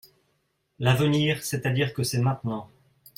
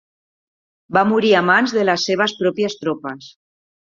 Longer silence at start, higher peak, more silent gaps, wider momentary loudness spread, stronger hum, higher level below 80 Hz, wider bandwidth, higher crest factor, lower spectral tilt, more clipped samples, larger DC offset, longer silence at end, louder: about the same, 0.8 s vs 0.9 s; second, -8 dBFS vs 0 dBFS; neither; about the same, 10 LU vs 12 LU; neither; about the same, -60 dBFS vs -64 dBFS; first, 16.5 kHz vs 7.4 kHz; about the same, 18 dB vs 18 dB; about the same, -5.5 dB/octave vs -4.5 dB/octave; neither; neither; about the same, 0.55 s vs 0.5 s; second, -25 LUFS vs -17 LUFS